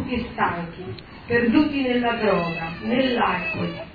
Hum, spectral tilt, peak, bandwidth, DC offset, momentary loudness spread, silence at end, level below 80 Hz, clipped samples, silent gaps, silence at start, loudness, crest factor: none; -8.5 dB/octave; -6 dBFS; 5 kHz; under 0.1%; 13 LU; 0 s; -46 dBFS; under 0.1%; none; 0 s; -22 LUFS; 18 dB